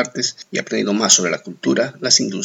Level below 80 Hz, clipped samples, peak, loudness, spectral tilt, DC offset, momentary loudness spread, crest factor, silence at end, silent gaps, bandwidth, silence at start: -78 dBFS; under 0.1%; 0 dBFS; -17 LUFS; -2 dB/octave; under 0.1%; 10 LU; 18 dB; 0 s; none; 19 kHz; 0 s